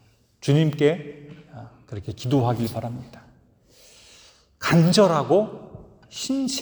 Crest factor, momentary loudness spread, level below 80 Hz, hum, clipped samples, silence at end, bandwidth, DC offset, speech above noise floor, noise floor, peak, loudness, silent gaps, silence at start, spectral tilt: 18 dB; 24 LU; -58 dBFS; none; under 0.1%; 0 s; over 20 kHz; under 0.1%; 35 dB; -56 dBFS; -4 dBFS; -22 LUFS; none; 0.45 s; -6 dB/octave